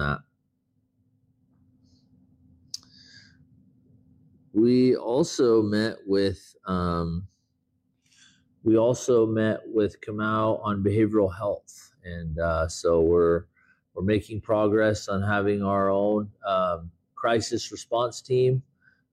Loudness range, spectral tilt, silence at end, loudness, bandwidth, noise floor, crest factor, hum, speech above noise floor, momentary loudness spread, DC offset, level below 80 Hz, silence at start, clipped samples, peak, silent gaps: 3 LU; -6.5 dB/octave; 0.5 s; -25 LUFS; 12.5 kHz; -73 dBFS; 14 dB; none; 49 dB; 13 LU; under 0.1%; -50 dBFS; 0 s; under 0.1%; -12 dBFS; none